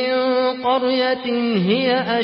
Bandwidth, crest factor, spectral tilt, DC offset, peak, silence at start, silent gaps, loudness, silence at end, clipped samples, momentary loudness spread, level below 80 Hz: 5.8 kHz; 14 dB; -10.5 dB/octave; under 0.1%; -6 dBFS; 0 s; none; -19 LUFS; 0 s; under 0.1%; 2 LU; -62 dBFS